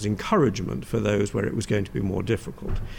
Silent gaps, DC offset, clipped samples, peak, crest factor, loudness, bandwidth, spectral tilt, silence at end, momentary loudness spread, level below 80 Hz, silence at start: none; under 0.1%; under 0.1%; -10 dBFS; 14 dB; -26 LUFS; 16.5 kHz; -6.5 dB/octave; 0 s; 8 LU; -38 dBFS; 0 s